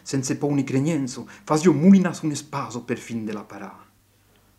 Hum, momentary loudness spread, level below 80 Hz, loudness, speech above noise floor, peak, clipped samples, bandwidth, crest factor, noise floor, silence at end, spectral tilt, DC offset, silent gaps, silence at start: none; 19 LU; -64 dBFS; -22 LUFS; 37 dB; -4 dBFS; under 0.1%; 12.5 kHz; 18 dB; -59 dBFS; 0.85 s; -6.5 dB/octave; under 0.1%; none; 0.05 s